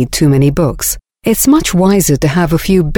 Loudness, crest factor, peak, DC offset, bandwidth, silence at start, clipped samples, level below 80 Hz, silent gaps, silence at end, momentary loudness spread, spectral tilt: -11 LUFS; 10 dB; 0 dBFS; under 0.1%; over 20 kHz; 0 s; under 0.1%; -28 dBFS; none; 0 s; 7 LU; -5.5 dB/octave